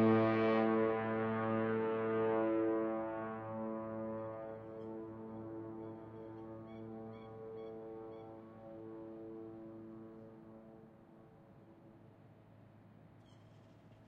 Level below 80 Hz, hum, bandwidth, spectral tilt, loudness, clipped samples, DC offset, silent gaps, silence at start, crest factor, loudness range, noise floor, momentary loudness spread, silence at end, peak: -74 dBFS; none; 5.4 kHz; -6.5 dB/octave; -39 LUFS; under 0.1%; under 0.1%; none; 0 s; 20 dB; 22 LU; -61 dBFS; 21 LU; 0 s; -20 dBFS